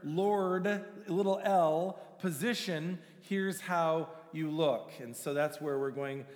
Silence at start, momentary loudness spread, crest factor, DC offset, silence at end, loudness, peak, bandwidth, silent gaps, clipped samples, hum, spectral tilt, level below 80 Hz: 0 s; 10 LU; 16 dB; under 0.1%; 0 s; -33 LUFS; -18 dBFS; over 20 kHz; none; under 0.1%; none; -5.5 dB/octave; under -90 dBFS